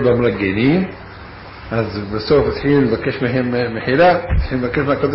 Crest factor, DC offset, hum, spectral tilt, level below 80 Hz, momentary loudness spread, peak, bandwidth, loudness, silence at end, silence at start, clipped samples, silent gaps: 12 dB; under 0.1%; none; -10 dB/octave; -30 dBFS; 15 LU; -4 dBFS; 5.8 kHz; -17 LUFS; 0 s; 0 s; under 0.1%; none